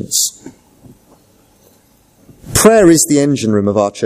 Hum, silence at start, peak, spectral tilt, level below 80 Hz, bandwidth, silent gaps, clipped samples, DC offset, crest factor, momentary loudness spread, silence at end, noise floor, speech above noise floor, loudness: none; 0 s; 0 dBFS; -4 dB/octave; -40 dBFS; 16 kHz; none; under 0.1%; under 0.1%; 14 dB; 8 LU; 0 s; -51 dBFS; 40 dB; -11 LUFS